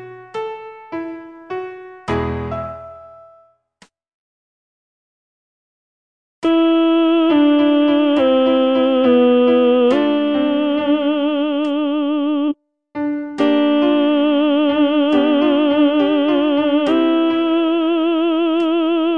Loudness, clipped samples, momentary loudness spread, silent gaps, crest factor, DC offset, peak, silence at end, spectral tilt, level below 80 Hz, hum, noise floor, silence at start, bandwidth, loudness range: -16 LUFS; under 0.1%; 15 LU; 4.14-6.42 s; 14 dB; under 0.1%; -2 dBFS; 0 s; -7 dB/octave; -48 dBFS; none; -54 dBFS; 0 s; 5.6 kHz; 14 LU